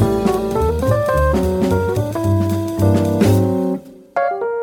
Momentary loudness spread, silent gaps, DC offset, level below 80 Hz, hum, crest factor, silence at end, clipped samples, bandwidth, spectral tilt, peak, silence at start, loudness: 6 LU; none; under 0.1%; -30 dBFS; none; 14 dB; 0 s; under 0.1%; 18 kHz; -7.5 dB/octave; -2 dBFS; 0 s; -17 LUFS